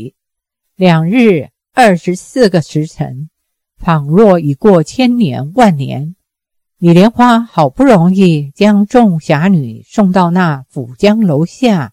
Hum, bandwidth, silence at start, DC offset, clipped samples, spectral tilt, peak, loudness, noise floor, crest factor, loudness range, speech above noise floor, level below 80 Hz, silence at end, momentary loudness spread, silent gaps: none; 12.5 kHz; 0 s; under 0.1%; 1%; -7 dB/octave; 0 dBFS; -10 LUFS; -76 dBFS; 10 dB; 3 LU; 66 dB; -44 dBFS; 0.05 s; 11 LU; none